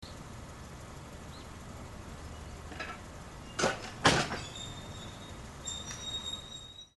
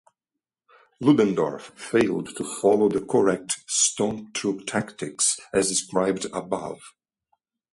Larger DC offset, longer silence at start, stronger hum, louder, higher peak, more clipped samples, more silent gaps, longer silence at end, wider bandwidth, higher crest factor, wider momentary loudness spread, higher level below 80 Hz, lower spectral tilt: neither; second, 0 s vs 1 s; neither; second, -36 LUFS vs -24 LUFS; about the same, -8 dBFS vs -6 dBFS; neither; neither; second, 0.1 s vs 0.85 s; about the same, 12 kHz vs 11.5 kHz; first, 30 dB vs 20 dB; first, 18 LU vs 11 LU; first, -52 dBFS vs -62 dBFS; about the same, -3 dB/octave vs -3.5 dB/octave